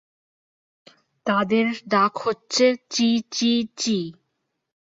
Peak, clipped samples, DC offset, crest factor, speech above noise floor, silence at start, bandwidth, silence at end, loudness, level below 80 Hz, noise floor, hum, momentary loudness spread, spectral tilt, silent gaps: -6 dBFS; under 0.1%; under 0.1%; 18 dB; 55 dB; 1.25 s; 7.8 kHz; 0.75 s; -22 LUFS; -68 dBFS; -77 dBFS; none; 7 LU; -3.5 dB/octave; none